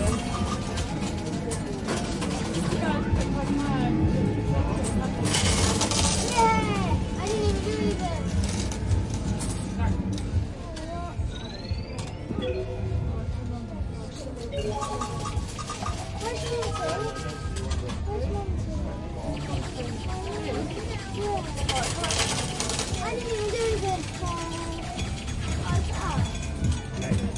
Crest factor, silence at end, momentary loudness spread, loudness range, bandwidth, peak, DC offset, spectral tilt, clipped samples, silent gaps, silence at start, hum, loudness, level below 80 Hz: 22 dB; 0 s; 9 LU; 8 LU; 11.5 kHz; -6 dBFS; under 0.1%; -5 dB/octave; under 0.1%; none; 0 s; none; -28 LUFS; -36 dBFS